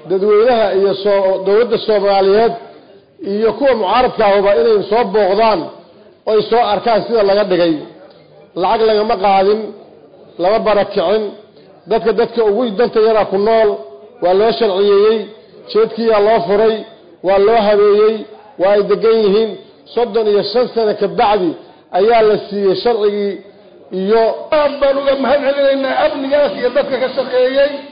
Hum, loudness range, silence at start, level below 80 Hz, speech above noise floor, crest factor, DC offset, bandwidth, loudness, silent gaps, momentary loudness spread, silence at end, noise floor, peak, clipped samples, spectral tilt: none; 2 LU; 0.05 s; -48 dBFS; 29 dB; 8 dB; 0.3%; 5.2 kHz; -13 LUFS; none; 9 LU; 0 s; -42 dBFS; -4 dBFS; under 0.1%; -10.5 dB/octave